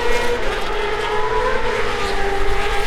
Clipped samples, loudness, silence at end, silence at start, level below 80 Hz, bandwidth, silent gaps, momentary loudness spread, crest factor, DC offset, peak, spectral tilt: under 0.1%; -21 LUFS; 0 s; 0 s; -26 dBFS; 13 kHz; none; 2 LU; 12 dB; under 0.1%; -4 dBFS; -3.5 dB/octave